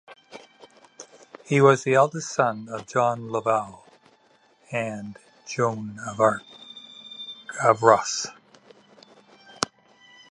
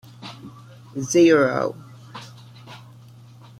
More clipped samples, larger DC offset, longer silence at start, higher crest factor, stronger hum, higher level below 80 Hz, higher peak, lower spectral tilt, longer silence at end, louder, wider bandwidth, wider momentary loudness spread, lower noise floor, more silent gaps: neither; neither; about the same, 0.1 s vs 0.2 s; first, 26 dB vs 20 dB; neither; about the same, -68 dBFS vs -64 dBFS; first, 0 dBFS vs -4 dBFS; about the same, -4.5 dB/octave vs -5 dB/octave; second, 0.7 s vs 0.85 s; second, -23 LUFS vs -19 LUFS; second, 11.5 kHz vs 13.5 kHz; about the same, 25 LU vs 27 LU; first, -60 dBFS vs -45 dBFS; neither